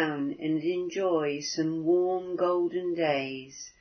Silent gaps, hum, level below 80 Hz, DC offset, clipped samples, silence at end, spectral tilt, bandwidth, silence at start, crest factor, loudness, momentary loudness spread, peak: none; none; -72 dBFS; under 0.1%; under 0.1%; 0.1 s; -5 dB/octave; 6.6 kHz; 0 s; 16 dB; -29 LUFS; 6 LU; -14 dBFS